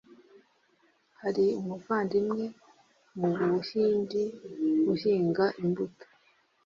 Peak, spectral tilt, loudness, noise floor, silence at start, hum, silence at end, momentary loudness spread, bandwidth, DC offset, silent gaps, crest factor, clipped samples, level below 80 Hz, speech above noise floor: -14 dBFS; -8 dB/octave; -29 LUFS; -68 dBFS; 0.1 s; none; 0.75 s; 9 LU; 7.2 kHz; under 0.1%; none; 16 dB; under 0.1%; -72 dBFS; 40 dB